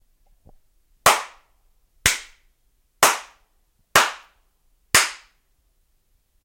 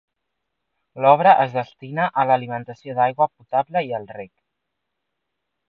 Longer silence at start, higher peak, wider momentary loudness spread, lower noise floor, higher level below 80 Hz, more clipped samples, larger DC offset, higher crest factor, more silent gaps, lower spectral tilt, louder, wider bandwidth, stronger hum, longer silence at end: about the same, 1.05 s vs 0.95 s; about the same, -2 dBFS vs 0 dBFS; about the same, 15 LU vs 16 LU; second, -65 dBFS vs -80 dBFS; first, -50 dBFS vs -72 dBFS; neither; neither; about the same, 24 dB vs 20 dB; neither; second, 0 dB/octave vs -8 dB/octave; about the same, -19 LUFS vs -20 LUFS; first, 16.5 kHz vs 5.2 kHz; neither; second, 1.3 s vs 1.45 s